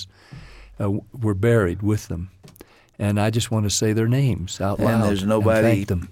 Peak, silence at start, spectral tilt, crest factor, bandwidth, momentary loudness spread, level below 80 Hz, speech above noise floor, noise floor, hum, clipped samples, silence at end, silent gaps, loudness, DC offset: -6 dBFS; 0 s; -6 dB/octave; 14 dB; 16 kHz; 9 LU; -44 dBFS; 22 dB; -42 dBFS; none; under 0.1%; 0 s; none; -21 LUFS; under 0.1%